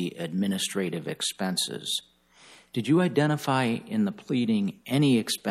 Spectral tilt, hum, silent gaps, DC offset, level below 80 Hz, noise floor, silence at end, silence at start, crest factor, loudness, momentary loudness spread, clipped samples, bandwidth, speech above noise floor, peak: -5 dB/octave; none; none; under 0.1%; -74 dBFS; -55 dBFS; 0 s; 0 s; 16 dB; -27 LUFS; 8 LU; under 0.1%; 15.5 kHz; 28 dB; -10 dBFS